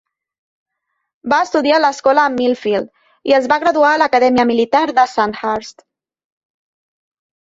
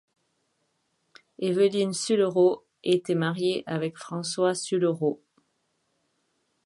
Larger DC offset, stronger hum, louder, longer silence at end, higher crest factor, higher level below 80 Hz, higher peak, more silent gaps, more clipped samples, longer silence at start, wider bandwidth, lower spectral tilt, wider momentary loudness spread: neither; neither; first, -14 LUFS vs -26 LUFS; first, 1.75 s vs 1.5 s; about the same, 16 dB vs 18 dB; first, -58 dBFS vs -76 dBFS; first, -2 dBFS vs -10 dBFS; neither; neither; second, 1.25 s vs 1.4 s; second, 7.8 kHz vs 11.5 kHz; about the same, -4 dB/octave vs -5 dB/octave; about the same, 9 LU vs 9 LU